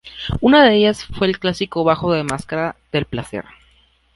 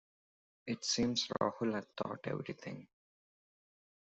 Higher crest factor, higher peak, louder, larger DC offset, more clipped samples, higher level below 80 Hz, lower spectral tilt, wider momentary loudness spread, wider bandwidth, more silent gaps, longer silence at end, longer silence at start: second, 16 dB vs 22 dB; first, -2 dBFS vs -18 dBFS; first, -17 LUFS vs -37 LUFS; neither; neither; first, -40 dBFS vs -70 dBFS; first, -5.5 dB/octave vs -4 dB/octave; about the same, 15 LU vs 15 LU; first, 11.5 kHz vs 8.2 kHz; neither; second, 0.75 s vs 1.25 s; second, 0.05 s vs 0.65 s